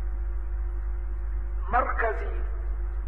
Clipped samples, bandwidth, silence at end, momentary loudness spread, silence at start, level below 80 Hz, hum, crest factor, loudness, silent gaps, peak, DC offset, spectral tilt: under 0.1%; 3.2 kHz; 0 s; 8 LU; 0 s; -30 dBFS; none; 16 dB; -31 LUFS; none; -10 dBFS; 2%; -9 dB/octave